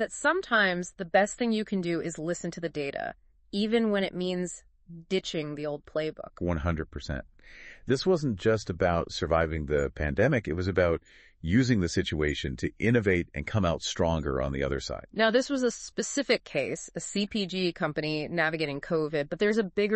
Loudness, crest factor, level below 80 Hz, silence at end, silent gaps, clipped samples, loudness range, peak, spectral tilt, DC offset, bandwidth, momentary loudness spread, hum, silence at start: -29 LUFS; 20 dB; -46 dBFS; 0 s; none; under 0.1%; 4 LU; -10 dBFS; -5 dB/octave; under 0.1%; 8.4 kHz; 9 LU; none; 0 s